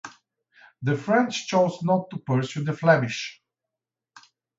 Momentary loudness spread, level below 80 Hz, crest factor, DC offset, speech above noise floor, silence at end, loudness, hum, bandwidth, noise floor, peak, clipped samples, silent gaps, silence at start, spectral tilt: 11 LU; -70 dBFS; 20 dB; under 0.1%; 64 dB; 1.25 s; -24 LUFS; none; 8 kHz; -88 dBFS; -4 dBFS; under 0.1%; none; 0.05 s; -6 dB/octave